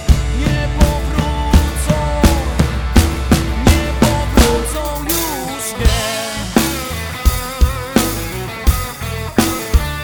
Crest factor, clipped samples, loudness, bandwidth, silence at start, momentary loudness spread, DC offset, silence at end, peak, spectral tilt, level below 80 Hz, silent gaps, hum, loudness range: 14 dB; under 0.1%; -16 LUFS; over 20 kHz; 0 s; 7 LU; under 0.1%; 0 s; 0 dBFS; -5 dB/octave; -18 dBFS; none; none; 3 LU